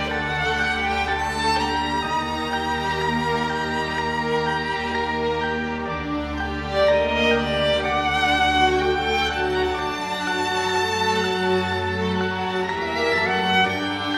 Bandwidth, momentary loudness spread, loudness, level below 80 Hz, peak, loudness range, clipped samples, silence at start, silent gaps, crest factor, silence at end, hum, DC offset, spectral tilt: 15.5 kHz; 6 LU; -22 LUFS; -42 dBFS; -8 dBFS; 3 LU; under 0.1%; 0 s; none; 16 dB; 0 s; none; under 0.1%; -4.5 dB/octave